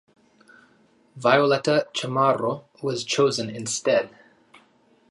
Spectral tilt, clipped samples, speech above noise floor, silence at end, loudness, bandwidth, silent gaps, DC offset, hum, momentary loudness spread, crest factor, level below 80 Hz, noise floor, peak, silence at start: -4 dB/octave; under 0.1%; 38 dB; 1 s; -23 LUFS; 11.5 kHz; none; under 0.1%; none; 10 LU; 22 dB; -72 dBFS; -60 dBFS; -2 dBFS; 1.15 s